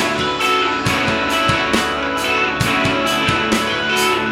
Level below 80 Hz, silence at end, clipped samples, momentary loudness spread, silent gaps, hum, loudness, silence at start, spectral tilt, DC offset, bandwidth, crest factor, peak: -40 dBFS; 0 s; under 0.1%; 2 LU; none; none; -16 LUFS; 0 s; -3.5 dB/octave; under 0.1%; 18 kHz; 16 dB; -2 dBFS